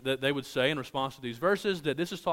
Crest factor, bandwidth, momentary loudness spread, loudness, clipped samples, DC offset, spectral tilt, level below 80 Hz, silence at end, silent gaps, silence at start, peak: 18 dB; 16 kHz; 5 LU; -30 LUFS; under 0.1%; under 0.1%; -5 dB/octave; -64 dBFS; 0 s; none; 0 s; -12 dBFS